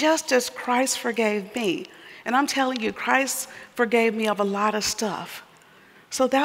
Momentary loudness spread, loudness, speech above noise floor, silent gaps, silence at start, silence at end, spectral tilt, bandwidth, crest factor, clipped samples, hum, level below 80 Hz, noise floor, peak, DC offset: 12 LU; -24 LUFS; 29 dB; none; 0 s; 0 s; -2.5 dB/octave; 16 kHz; 20 dB; under 0.1%; none; -66 dBFS; -52 dBFS; -4 dBFS; under 0.1%